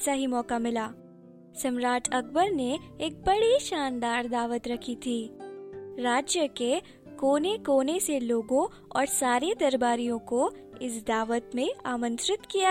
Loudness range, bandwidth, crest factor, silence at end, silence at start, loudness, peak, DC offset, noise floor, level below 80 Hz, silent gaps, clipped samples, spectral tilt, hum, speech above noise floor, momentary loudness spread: 3 LU; 16 kHz; 16 dB; 0 s; 0 s; -28 LUFS; -12 dBFS; under 0.1%; -51 dBFS; -58 dBFS; none; under 0.1%; -2.5 dB/octave; none; 23 dB; 9 LU